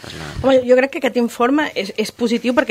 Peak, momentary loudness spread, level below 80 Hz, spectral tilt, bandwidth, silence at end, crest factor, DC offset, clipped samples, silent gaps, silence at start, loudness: -2 dBFS; 8 LU; -44 dBFS; -5 dB/octave; 15.5 kHz; 0 s; 16 dB; under 0.1%; under 0.1%; none; 0 s; -17 LUFS